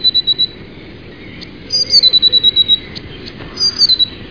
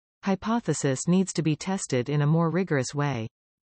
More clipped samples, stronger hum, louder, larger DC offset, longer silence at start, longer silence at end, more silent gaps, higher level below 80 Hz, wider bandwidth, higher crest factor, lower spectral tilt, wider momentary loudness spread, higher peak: neither; neither; first, -9 LUFS vs -26 LUFS; first, 0.6% vs under 0.1%; second, 0 s vs 0.25 s; second, 0 s vs 0.35 s; neither; first, -42 dBFS vs -62 dBFS; second, 5.4 kHz vs 8.8 kHz; about the same, 14 dB vs 14 dB; second, -1.5 dB/octave vs -6 dB/octave; first, 23 LU vs 6 LU; first, 0 dBFS vs -12 dBFS